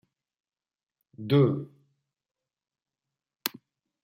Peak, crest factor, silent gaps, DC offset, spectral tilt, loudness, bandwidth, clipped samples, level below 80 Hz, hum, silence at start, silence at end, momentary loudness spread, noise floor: -6 dBFS; 26 dB; none; under 0.1%; -6.5 dB/octave; -27 LUFS; 16 kHz; under 0.1%; -76 dBFS; none; 1.2 s; 0.55 s; 19 LU; under -90 dBFS